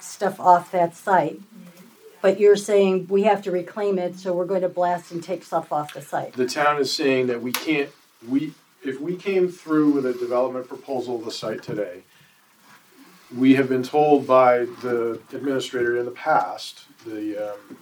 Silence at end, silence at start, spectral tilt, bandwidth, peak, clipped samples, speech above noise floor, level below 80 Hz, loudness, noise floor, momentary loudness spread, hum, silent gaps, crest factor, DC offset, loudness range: 0.05 s; 0 s; -5.5 dB/octave; over 20 kHz; -2 dBFS; under 0.1%; 34 dB; -78 dBFS; -22 LUFS; -55 dBFS; 13 LU; none; none; 20 dB; under 0.1%; 5 LU